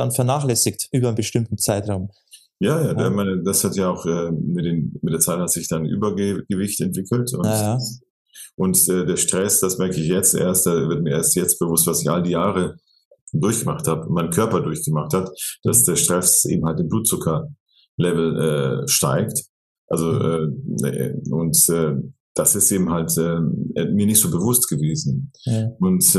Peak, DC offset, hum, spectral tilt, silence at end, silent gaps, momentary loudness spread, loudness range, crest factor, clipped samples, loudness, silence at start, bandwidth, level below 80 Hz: 0 dBFS; under 0.1%; none; -4.5 dB/octave; 0 s; 8.10-8.26 s, 8.54-8.58 s, 13.05-13.11 s, 13.21-13.27 s, 17.60-17.66 s, 17.89-17.98 s, 19.49-19.88 s, 22.20-22.35 s; 9 LU; 4 LU; 20 dB; under 0.1%; -19 LUFS; 0 s; 13 kHz; -52 dBFS